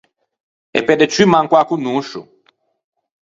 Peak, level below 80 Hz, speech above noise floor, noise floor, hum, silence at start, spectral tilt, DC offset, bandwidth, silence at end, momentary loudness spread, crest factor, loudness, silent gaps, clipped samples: 0 dBFS; -58 dBFS; 45 dB; -59 dBFS; none; 0.75 s; -5 dB/octave; under 0.1%; 7.8 kHz; 1.1 s; 13 LU; 18 dB; -14 LUFS; none; under 0.1%